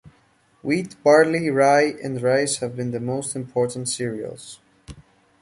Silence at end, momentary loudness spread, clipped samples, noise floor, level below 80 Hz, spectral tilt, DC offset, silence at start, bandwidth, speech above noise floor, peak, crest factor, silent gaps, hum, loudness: 0.4 s; 16 LU; under 0.1%; -60 dBFS; -58 dBFS; -4.5 dB/octave; under 0.1%; 0.65 s; 11.5 kHz; 39 dB; -4 dBFS; 20 dB; none; none; -21 LUFS